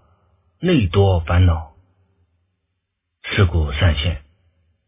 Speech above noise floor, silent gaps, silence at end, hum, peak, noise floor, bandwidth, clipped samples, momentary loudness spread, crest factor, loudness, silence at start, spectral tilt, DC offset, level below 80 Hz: 60 dB; none; 0.7 s; none; -2 dBFS; -75 dBFS; 3.8 kHz; under 0.1%; 9 LU; 16 dB; -18 LUFS; 0.6 s; -11 dB/octave; under 0.1%; -26 dBFS